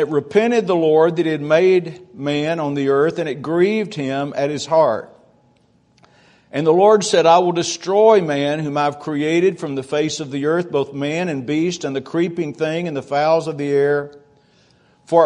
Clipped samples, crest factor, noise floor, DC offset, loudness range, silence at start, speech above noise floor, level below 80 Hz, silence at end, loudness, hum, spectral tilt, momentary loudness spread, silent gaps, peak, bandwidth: under 0.1%; 18 dB; -57 dBFS; under 0.1%; 5 LU; 0 s; 40 dB; -64 dBFS; 0 s; -18 LUFS; none; -5.5 dB/octave; 10 LU; none; 0 dBFS; 10.5 kHz